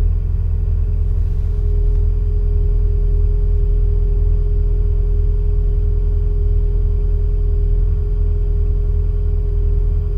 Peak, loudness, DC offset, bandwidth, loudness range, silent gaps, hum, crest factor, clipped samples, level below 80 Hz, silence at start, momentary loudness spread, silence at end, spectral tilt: -6 dBFS; -19 LUFS; under 0.1%; 1.5 kHz; 1 LU; none; none; 10 dB; under 0.1%; -16 dBFS; 0 s; 1 LU; 0 s; -11 dB/octave